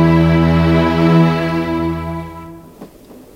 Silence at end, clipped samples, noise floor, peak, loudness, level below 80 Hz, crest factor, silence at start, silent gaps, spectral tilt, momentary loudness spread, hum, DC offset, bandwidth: 0.25 s; under 0.1%; -39 dBFS; -2 dBFS; -14 LUFS; -32 dBFS; 14 dB; 0 s; none; -8.5 dB/octave; 15 LU; none; under 0.1%; 6.6 kHz